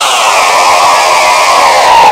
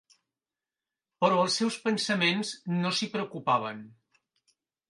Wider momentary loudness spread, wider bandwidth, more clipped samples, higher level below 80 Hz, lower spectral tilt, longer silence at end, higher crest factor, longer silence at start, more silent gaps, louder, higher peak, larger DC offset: second, 2 LU vs 7 LU; first, over 20 kHz vs 11.5 kHz; first, 5% vs under 0.1%; first, -42 dBFS vs -78 dBFS; second, 0.5 dB/octave vs -4 dB/octave; second, 0 s vs 1 s; second, 6 dB vs 22 dB; second, 0 s vs 1.2 s; neither; first, -5 LUFS vs -28 LUFS; first, 0 dBFS vs -8 dBFS; neither